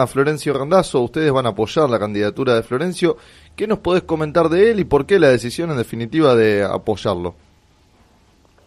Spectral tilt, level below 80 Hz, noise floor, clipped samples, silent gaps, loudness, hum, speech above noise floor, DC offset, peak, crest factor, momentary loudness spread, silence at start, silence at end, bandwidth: -6 dB/octave; -48 dBFS; -54 dBFS; under 0.1%; none; -17 LUFS; none; 37 dB; under 0.1%; -2 dBFS; 16 dB; 9 LU; 0 s; 1.35 s; 14.5 kHz